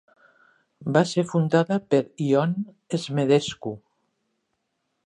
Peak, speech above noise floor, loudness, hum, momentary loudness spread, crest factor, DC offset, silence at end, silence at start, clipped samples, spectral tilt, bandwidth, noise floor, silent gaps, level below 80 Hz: -4 dBFS; 54 dB; -23 LUFS; none; 13 LU; 20 dB; under 0.1%; 1.3 s; 0.8 s; under 0.1%; -6.5 dB/octave; 10.5 kHz; -76 dBFS; none; -68 dBFS